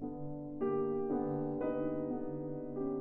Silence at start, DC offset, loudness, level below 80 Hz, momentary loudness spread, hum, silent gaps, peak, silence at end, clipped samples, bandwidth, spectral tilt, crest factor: 0 s; under 0.1%; -38 LUFS; -62 dBFS; 7 LU; none; none; -24 dBFS; 0 s; under 0.1%; 3.2 kHz; -10 dB/octave; 12 dB